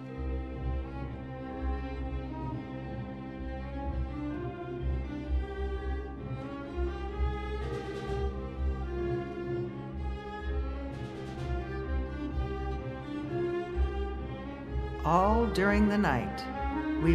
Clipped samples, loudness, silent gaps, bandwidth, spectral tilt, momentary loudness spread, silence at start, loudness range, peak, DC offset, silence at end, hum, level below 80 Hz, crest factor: under 0.1%; -34 LUFS; none; 11.5 kHz; -8 dB/octave; 12 LU; 0 s; 8 LU; -10 dBFS; under 0.1%; 0 s; none; -38 dBFS; 22 dB